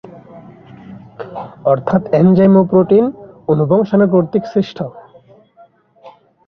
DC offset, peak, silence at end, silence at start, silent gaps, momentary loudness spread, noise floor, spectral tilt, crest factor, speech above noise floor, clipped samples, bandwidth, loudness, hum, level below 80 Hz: under 0.1%; -2 dBFS; 0.4 s; 0.15 s; none; 18 LU; -48 dBFS; -10.5 dB/octave; 14 dB; 35 dB; under 0.1%; 5.8 kHz; -13 LUFS; none; -52 dBFS